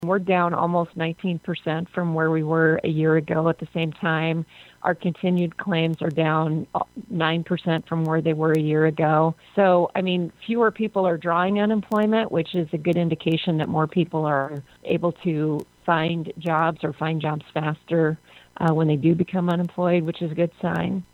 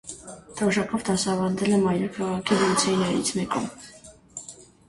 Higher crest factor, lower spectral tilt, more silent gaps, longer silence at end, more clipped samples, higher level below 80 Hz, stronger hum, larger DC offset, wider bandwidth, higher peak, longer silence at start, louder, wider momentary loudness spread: about the same, 18 dB vs 18 dB; first, -8.5 dB/octave vs -4.5 dB/octave; neither; second, 0.1 s vs 0.25 s; neither; about the same, -60 dBFS vs -56 dBFS; neither; neither; second, 5.2 kHz vs 11.5 kHz; first, -4 dBFS vs -8 dBFS; about the same, 0 s vs 0.05 s; about the same, -23 LUFS vs -24 LUFS; second, 7 LU vs 19 LU